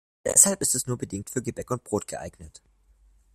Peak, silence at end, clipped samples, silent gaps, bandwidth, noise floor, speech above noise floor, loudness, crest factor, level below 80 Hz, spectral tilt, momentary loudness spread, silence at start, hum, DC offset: 0 dBFS; 0.85 s; under 0.1%; none; 16 kHz; -60 dBFS; 33 dB; -23 LUFS; 26 dB; -56 dBFS; -3 dB/octave; 19 LU; 0.25 s; none; under 0.1%